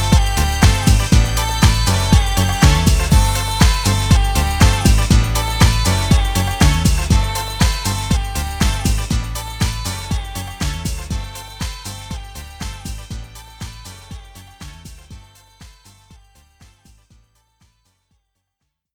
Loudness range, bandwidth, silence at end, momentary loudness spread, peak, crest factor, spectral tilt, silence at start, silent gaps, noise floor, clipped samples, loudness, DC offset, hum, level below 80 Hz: 19 LU; over 20 kHz; 3.25 s; 19 LU; 0 dBFS; 16 dB; -4.5 dB/octave; 0 s; none; -75 dBFS; under 0.1%; -16 LUFS; under 0.1%; none; -20 dBFS